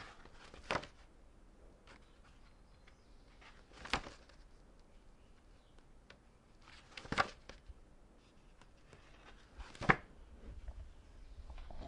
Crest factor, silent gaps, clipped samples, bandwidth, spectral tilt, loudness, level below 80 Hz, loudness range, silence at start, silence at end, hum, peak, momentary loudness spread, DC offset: 38 dB; none; under 0.1%; 11 kHz; -4.5 dB/octave; -40 LUFS; -58 dBFS; 8 LU; 0 s; 0 s; none; -8 dBFS; 28 LU; under 0.1%